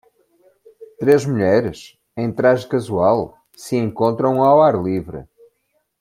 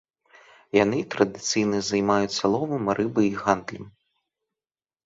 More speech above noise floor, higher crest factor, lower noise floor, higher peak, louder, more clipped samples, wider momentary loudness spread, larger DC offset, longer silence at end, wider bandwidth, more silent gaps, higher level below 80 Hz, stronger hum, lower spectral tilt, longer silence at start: second, 52 dB vs over 66 dB; about the same, 18 dB vs 22 dB; second, -68 dBFS vs under -90 dBFS; about the same, -2 dBFS vs -4 dBFS; first, -17 LUFS vs -24 LUFS; neither; first, 20 LU vs 3 LU; neither; second, 0.75 s vs 1.15 s; first, 16 kHz vs 7.8 kHz; neither; first, -54 dBFS vs -60 dBFS; neither; first, -7 dB/octave vs -4.5 dB/octave; about the same, 0.8 s vs 0.75 s